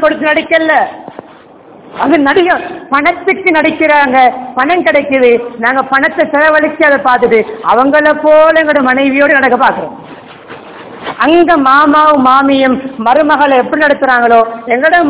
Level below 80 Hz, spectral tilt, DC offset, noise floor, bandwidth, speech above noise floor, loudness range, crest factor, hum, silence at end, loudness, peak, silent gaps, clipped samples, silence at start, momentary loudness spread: -48 dBFS; -8 dB/octave; under 0.1%; -36 dBFS; 4 kHz; 28 dB; 3 LU; 8 dB; none; 0 s; -8 LUFS; 0 dBFS; none; 3%; 0 s; 7 LU